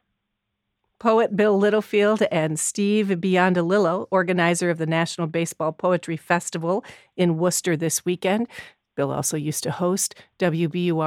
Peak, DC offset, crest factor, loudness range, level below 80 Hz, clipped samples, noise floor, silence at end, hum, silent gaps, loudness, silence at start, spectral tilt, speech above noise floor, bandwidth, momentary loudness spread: -4 dBFS; under 0.1%; 20 dB; 4 LU; -70 dBFS; under 0.1%; -79 dBFS; 0 s; none; none; -22 LUFS; 1.05 s; -5 dB/octave; 57 dB; 16.5 kHz; 7 LU